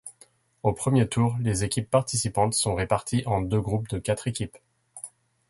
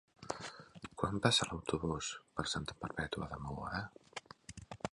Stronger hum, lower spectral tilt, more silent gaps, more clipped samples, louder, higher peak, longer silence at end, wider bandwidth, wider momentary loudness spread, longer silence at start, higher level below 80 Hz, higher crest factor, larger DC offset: neither; about the same, -5 dB/octave vs -4 dB/octave; neither; neither; first, -26 LUFS vs -38 LUFS; first, -8 dBFS vs -12 dBFS; first, 0.4 s vs 0.05 s; about the same, 12 kHz vs 11.5 kHz; second, 15 LU vs 20 LU; second, 0.05 s vs 0.2 s; first, -48 dBFS vs -58 dBFS; second, 18 dB vs 28 dB; neither